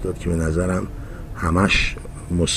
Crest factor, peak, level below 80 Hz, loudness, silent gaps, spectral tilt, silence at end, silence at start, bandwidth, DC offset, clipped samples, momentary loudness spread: 18 dB; -2 dBFS; -30 dBFS; -21 LUFS; none; -5 dB/octave; 0 s; 0 s; 14.5 kHz; 0.2%; under 0.1%; 17 LU